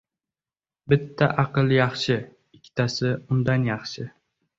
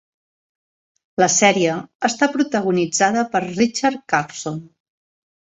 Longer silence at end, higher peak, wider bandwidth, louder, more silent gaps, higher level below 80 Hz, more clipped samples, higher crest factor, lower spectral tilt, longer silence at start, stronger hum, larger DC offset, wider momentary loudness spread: second, 0.5 s vs 0.9 s; about the same, -4 dBFS vs -2 dBFS; about the same, 7.8 kHz vs 8.4 kHz; second, -23 LUFS vs -18 LUFS; second, none vs 1.95-2.00 s; first, -56 dBFS vs -62 dBFS; neither; about the same, 20 dB vs 18 dB; first, -6.5 dB/octave vs -3.5 dB/octave; second, 0.85 s vs 1.2 s; neither; neither; about the same, 12 LU vs 13 LU